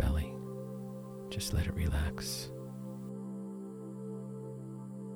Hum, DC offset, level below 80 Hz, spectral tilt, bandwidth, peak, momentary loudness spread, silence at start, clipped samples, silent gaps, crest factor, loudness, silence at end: none; under 0.1%; -42 dBFS; -5.5 dB/octave; over 20 kHz; -18 dBFS; 11 LU; 0 s; under 0.1%; none; 20 dB; -39 LUFS; 0 s